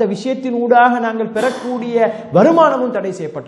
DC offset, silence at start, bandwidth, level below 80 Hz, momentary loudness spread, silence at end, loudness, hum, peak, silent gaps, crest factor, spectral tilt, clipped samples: under 0.1%; 0 s; 12 kHz; -64 dBFS; 10 LU; 0 s; -15 LUFS; none; 0 dBFS; none; 14 dB; -6.5 dB/octave; under 0.1%